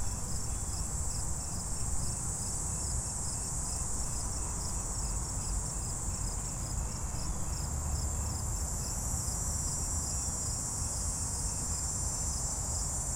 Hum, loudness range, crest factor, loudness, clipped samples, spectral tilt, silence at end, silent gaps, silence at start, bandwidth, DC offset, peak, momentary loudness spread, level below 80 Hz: none; 3 LU; 14 dB; -34 LUFS; under 0.1%; -3 dB/octave; 0 s; none; 0 s; 16.5 kHz; under 0.1%; -20 dBFS; 3 LU; -40 dBFS